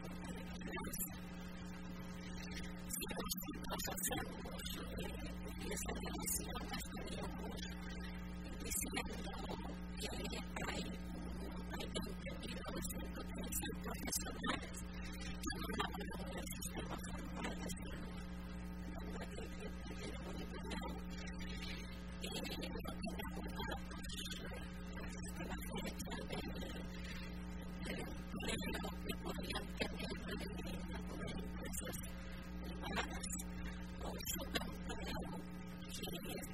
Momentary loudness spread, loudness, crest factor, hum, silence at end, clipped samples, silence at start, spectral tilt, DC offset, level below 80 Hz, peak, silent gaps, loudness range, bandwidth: 7 LU; -45 LUFS; 24 dB; none; 0 s; under 0.1%; 0 s; -4 dB/octave; 0.1%; -52 dBFS; -22 dBFS; none; 3 LU; 16 kHz